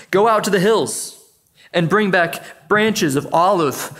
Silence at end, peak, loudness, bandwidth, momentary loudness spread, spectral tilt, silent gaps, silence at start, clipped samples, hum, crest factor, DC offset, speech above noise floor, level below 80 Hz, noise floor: 0 s; -2 dBFS; -17 LUFS; 16 kHz; 8 LU; -4.5 dB/octave; none; 0 s; under 0.1%; none; 16 dB; under 0.1%; 35 dB; -60 dBFS; -52 dBFS